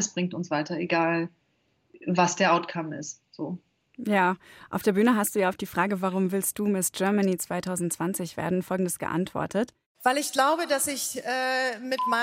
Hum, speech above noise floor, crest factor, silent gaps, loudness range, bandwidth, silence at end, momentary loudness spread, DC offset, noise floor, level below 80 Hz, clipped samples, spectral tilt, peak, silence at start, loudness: none; 43 dB; 18 dB; 9.86-9.95 s; 2 LU; 16.5 kHz; 0 s; 12 LU; under 0.1%; -70 dBFS; -66 dBFS; under 0.1%; -4 dB/octave; -8 dBFS; 0 s; -27 LUFS